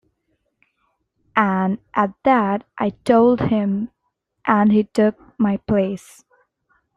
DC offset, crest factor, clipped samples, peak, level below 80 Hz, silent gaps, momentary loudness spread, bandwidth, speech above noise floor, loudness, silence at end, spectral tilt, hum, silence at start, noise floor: under 0.1%; 18 dB; under 0.1%; -2 dBFS; -54 dBFS; none; 10 LU; 10.5 kHz; 56 dB; -19 LUFS; 1 s; -8 dB/octave; none; 1.35 s; -74 dBFS